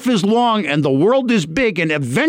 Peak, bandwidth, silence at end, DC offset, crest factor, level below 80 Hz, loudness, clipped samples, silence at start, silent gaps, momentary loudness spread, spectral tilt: -6 dBFS; 16 kHz; 0 s; under 0.1%; 10 dB; -48 dBFS; -16 LUFS; under 0.1%; 0 s; none; 3 LU; -5.5 dB/octave